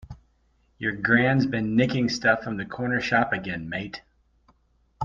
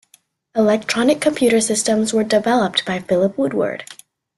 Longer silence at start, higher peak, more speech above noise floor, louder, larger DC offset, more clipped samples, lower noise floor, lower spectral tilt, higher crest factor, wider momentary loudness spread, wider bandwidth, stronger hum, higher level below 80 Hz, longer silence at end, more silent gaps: second, 0.1 s vs 0.55 s; second, -6 dBFS vs -2 dBFS; about the same, 41 dB vs 39 dB; second, -24 LUFS vs -17 LUFS; neither; neither; first, -65 dBFS vs -56 dBFS; first, -6 dB/octave vs -3.5 dB/octave; about the same, 20 dB vs 16 dB; first, 12 LU vs 7 LU; second, 7.4 kHz vs 12.5 kHz; neither; about the same, -54 dBFS vs -58 dBFS; second, 0 s vs 0.45 s; neither